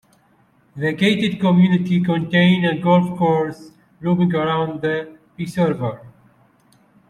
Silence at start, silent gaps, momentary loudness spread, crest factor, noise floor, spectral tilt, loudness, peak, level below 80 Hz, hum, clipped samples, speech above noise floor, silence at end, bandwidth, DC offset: 0.75 s; none; 12 LU; 16 dB; -57 dBFS; -7.5 dB/octave; -18 LUFS; -4 dBFS; -58 dBFS; none; under 0.1%; 40 dB; 1 s; 9.6 kHz; under 0.1%